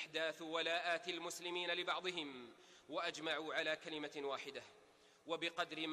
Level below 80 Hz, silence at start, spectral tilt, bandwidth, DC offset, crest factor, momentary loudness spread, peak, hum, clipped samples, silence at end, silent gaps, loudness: -86 dBFS; 0 s; -2.5 dB/octave; 13.5 kHz; under 0.1%; 18 dB; 14 LU; -26 dBFS; none; under 0.1%; 0 s; none; -42 LUFS